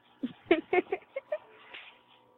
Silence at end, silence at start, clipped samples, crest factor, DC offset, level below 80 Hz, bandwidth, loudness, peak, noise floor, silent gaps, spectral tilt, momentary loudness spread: 0.5 s; 0.25 s; under 0.1%; 24 dB; under 0.1%; -72 dBFS; 4.2 kHz; -32 LUFS; -10 dBFS; -59 dBFS; none; -7.5 dB/octave; 21 LU